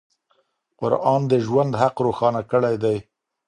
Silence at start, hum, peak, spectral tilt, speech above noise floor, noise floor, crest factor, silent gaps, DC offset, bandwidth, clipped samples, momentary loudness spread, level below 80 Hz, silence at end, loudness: 0.8 s; none; -2 dBFS; -8 dB/octave; 47 dB; -67 dBFS; 20 dB; none; under 0.1%; 10.5 kHz; under 0.1%; 5 LU; -58 dBFS; 0.45 s; -21 LUFS